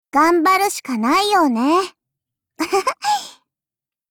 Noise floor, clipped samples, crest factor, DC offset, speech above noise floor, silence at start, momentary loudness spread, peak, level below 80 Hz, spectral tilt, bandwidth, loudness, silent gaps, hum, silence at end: -89 dBFS; under 0.1%; 14 dB; under 0.1%; 73 dB; 0.15 s; 10 LU; -6 dBFS; -60 dBFS; -2.5 dB/octave; over 20 kHz; -17 LUFS; none; none; 0.8 s